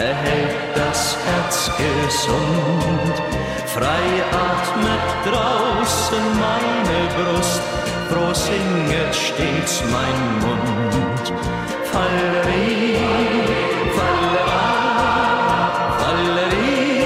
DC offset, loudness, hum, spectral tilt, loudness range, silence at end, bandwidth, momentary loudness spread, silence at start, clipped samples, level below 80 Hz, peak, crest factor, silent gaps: under 0.1%; -18 LUFS; none; -4.5 dB/octave; 2 LU; 0 s; 16 kHz; 4 LU; 0 s; under 0.1%; -36 dBFS; -6 dBFS; 12 dB; none